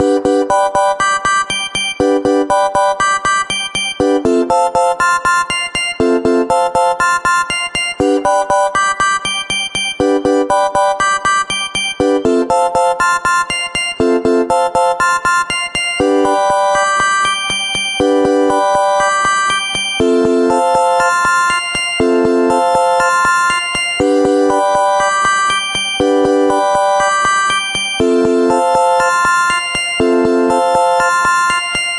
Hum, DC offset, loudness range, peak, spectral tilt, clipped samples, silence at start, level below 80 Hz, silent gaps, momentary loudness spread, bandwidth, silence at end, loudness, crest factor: none; under 0.1%; 2 LU; -2 dBFS; -2.5 dB/octave; under 0.1%; 0 s; -42 dBFS; none; 3 LU; 11.5 kHz; 0 s; -13 LUFS; 12 dB